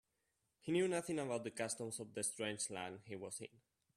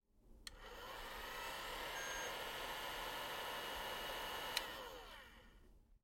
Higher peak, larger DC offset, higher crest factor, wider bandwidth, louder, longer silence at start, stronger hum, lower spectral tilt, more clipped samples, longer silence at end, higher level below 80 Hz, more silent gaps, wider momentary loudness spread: about the same, -24 dBFS vs -22 dBFS; neither; second, 18 dB vs 28 dB; second, 14 kHz vs 16.5 kHz; first, -42 LUFS vs -46 LUFS; first, 0.65 s vs 0.15 s; neither; first, -3.5 dB/octave vs -1 dB/octave; neither; first, 0.5 s vs 0.05 s; second, -82 dBFS vs -64 dBFS; neither; about the same, 12 LU vs 13 LU